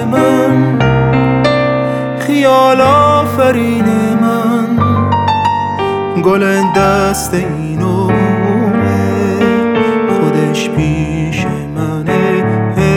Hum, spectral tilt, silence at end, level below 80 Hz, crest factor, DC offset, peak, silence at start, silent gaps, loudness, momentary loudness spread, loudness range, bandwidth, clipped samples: none; -6.5 dB/octave; 0 s; -34 dBFS; 10 dB; under 0.1%; 0 dBFS; 0 s; none; -12 LUFS; 7 LU; 3 LU; 18.5 kHz; under 0.1%